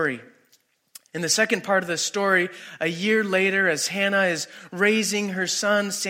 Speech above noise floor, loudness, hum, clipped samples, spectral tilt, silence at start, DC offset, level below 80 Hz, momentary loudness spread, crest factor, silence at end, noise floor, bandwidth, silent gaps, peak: 40 dB; -22 LUFS; none; under 0.1%; -3 dB/octave; 0 s; under 0.1%; -74 dBFS; 9 LU; 18 dB; 0 s; -63 dBFS; 16.5 kHz; none; -6 dBFS